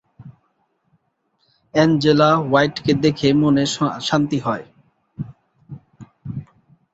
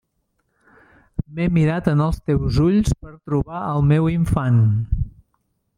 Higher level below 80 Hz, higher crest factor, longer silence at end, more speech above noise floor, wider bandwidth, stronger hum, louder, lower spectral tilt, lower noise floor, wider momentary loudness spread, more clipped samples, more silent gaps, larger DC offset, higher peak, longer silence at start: second, -54 dBFS vs -34 dBFS; about the same, 18 dB vs 16 dB; second, 0.5 s vs 0.65 s; about the same, 51 dB vs 52 dB; second, 8 kHz vs 11.5 kHz; neither; first, -17 LUFS vs -20 LUFS; second, -6 dB/octave vs -8.5 dB/octave; about the same, -67 dBFS vs -70 dBFS; first, 19 LU vs 11 LU; neither; neither; neither; about the same, -2 dBFS vs -4 dBFS; second, 0.2 s vs 1.2 s